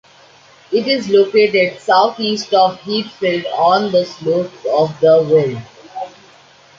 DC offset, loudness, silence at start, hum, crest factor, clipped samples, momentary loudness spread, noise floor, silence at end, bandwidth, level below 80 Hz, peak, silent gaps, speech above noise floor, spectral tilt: under 0.1%; -15 LUFS; 0.7 s; none; 14 dB; under 0.1%; 13 LU; -46 dBFS; 0.7 s; 7.6 kHz; -60 dBFS; -2 dBFS; none; 31 dB; -5.5 dB/octave